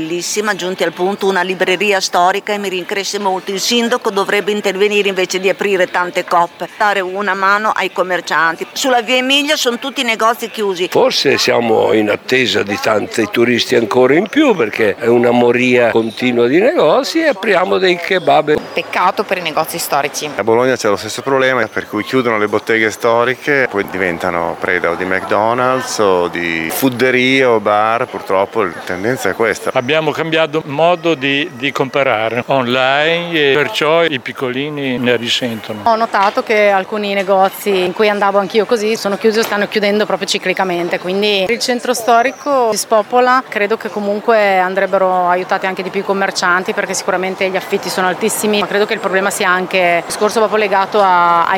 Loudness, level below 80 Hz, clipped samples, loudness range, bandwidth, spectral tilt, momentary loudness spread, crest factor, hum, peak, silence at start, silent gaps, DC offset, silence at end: -14 LUFS; -58 dBFS; under 0.1%; 3 LU; 20 kHz; -3.5 dB/octave; 6 LU; 14 dB; none; 0 dBFS; 0 s; none; under 0.1%; 0 s